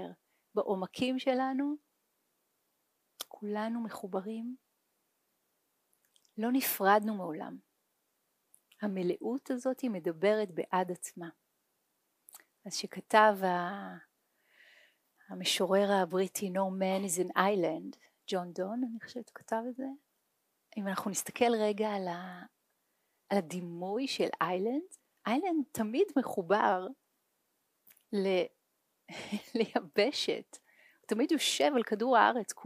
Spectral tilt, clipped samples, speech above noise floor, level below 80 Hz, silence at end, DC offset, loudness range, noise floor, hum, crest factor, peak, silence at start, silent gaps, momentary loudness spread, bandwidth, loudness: -4 dB/octave; under 0.1%; 47 dB; -84 dBFS; 0 s; under 0.1%; 7 LU; -79 dBFS; none; 24 dB; -10 dBFS; 0 s; none; 17 LU; 15.5 kHz; -32 LUFS